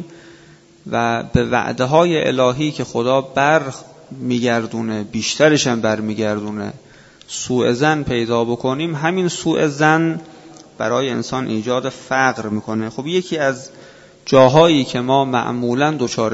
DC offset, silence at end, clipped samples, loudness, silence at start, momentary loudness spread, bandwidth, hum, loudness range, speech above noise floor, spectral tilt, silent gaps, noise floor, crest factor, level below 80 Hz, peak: under 0.1%; 0 s; under 0.1%; -17 LUFS; 0 s; 11 LU; 8 kHz; none; 4 LU; 29 dB; -5 dB/octave; none; -46 dBFS; 18 dB; -48 dBFS; 0 dBFS